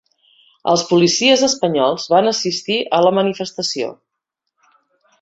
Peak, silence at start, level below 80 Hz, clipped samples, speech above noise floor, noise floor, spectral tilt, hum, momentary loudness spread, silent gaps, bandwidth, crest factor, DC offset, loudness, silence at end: -2 dBFS; 0.65 s; -62 dBFS; under 0.1%; 62 dB; -78 dBFS; -3.5 dB/octave; none; 9 LU; none; 8 kHz; 16 dB; under 0.1%; -16 LUFS; 1.3 s